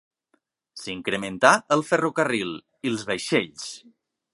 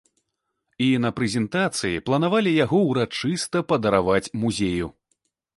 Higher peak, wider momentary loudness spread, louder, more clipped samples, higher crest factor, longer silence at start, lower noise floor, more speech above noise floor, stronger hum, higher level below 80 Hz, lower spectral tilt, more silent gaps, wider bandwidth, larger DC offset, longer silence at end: first, 0 dBFS vs -4 dBFS; first, 18 LU vs 6 LU; about the same, -23 LUFS vs -22 LUFS; neither; about the same, 24 dB vs 20 dB; about the same, 0.75 s vs 0.8 s; second, -71 dBFS vs -78 dBFS; second, 47 dB vs 56 dB; neither; second, -66 dBFS vs -50 dBFS; second, -4 dB/octave vs -5.5 dB/octave; neither; about the same, 11.5 kHz vs 11.5 kHz; neither; about the same, 0.55 s vs 0.65 s